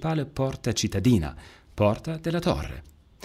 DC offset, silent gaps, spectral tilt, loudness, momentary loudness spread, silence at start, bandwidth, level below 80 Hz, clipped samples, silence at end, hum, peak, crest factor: under 0.1%; none; -6 dB/octave; -26 LUFS; 17 LU; 0 s; 15.5 kHz; -42 dBFS; under 0.1%; 0.35 s; none; -10 dBFS; 16 dB